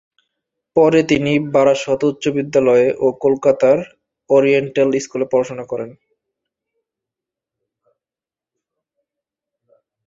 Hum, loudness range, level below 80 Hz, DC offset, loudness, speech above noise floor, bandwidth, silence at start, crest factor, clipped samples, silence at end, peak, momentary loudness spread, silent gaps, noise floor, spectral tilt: none; 11 LU; -58 dBFS; under 0.1%; -16 LUFS; 75 dB; 8 kHz; 0.75 s; 16 dB; under 0.1%; 4.15 s; -2 dBFS; 10 LU; none; -90 dBFS; -6 dB/octave